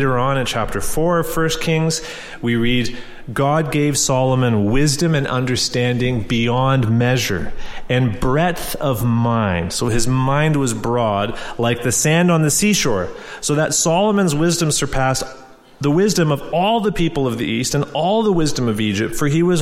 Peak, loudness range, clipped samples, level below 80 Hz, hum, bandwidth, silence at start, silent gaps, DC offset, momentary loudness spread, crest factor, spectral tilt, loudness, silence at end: -4 dBFS; 2 LU; under 0.1%; -34 dBFS; none; 16 kHz; 0 s; none; under 0.1%; 6 LU; 14 dB; -4.5 dB/octave; -18 LUFS; 0 s